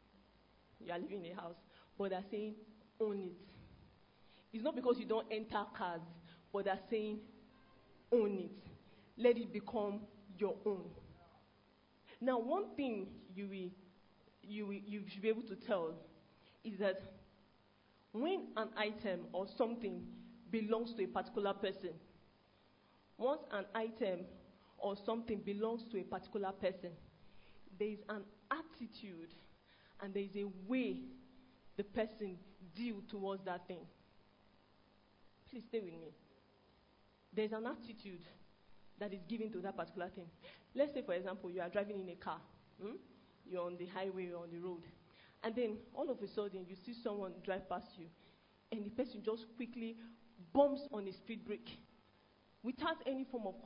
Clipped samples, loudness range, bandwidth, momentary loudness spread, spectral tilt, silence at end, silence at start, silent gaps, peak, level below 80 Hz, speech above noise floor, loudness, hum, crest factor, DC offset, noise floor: under 0.1%; 6 LU; 5.2 kHz; 17 LU; -4.5 dB/octave; 0 s; 0.8 s; none; -20 dBFS; -76 dBFS; 29 dB; -43 LUFS; none; 24 dB; under 0.1%; -71 dBFS